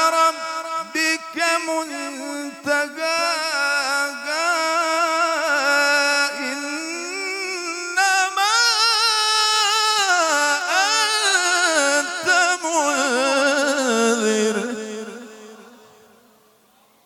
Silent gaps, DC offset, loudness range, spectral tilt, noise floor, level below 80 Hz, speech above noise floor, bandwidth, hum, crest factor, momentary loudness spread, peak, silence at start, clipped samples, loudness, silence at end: none; under 0.1%; 5 LU; -0.5 dB/octave; -57 dBFS; -74 dBFS; 32 dB; 19 kHz; none; 16 dB; 10 LU; -6 dBFS; 0 s; under 0.1%; -19 LUFS; 1.3 s